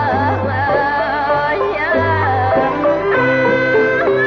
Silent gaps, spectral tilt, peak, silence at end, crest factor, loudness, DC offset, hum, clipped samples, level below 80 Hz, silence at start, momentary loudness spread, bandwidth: none; -7.5 dB/octave; -4 dBFS; 0 s; 10 dB; -15 LUFS; under 0.1%; none; under 0.1%; -42 dBFS; 0 s; 3 LU; 6.6 kHz